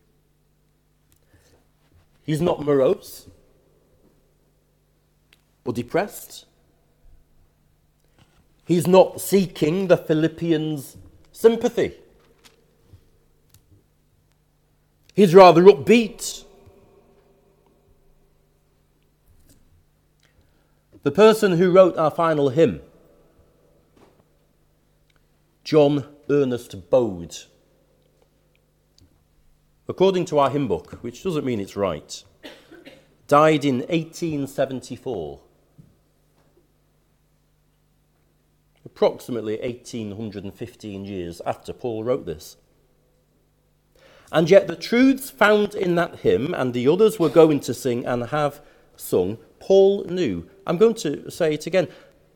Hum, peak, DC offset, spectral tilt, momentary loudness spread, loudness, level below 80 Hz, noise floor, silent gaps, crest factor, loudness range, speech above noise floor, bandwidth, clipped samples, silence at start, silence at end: 50 Hz at -60 dBFS; 0 dBFS; under 0.1%; -6 dB/octave; 19 LU; -20 LUFS; -58 dBFS; -63 dBFS; none; 22 dB; 15 LU; 44 dB; 18 kHz; under 0.1%; 2.3 s; 0.45 s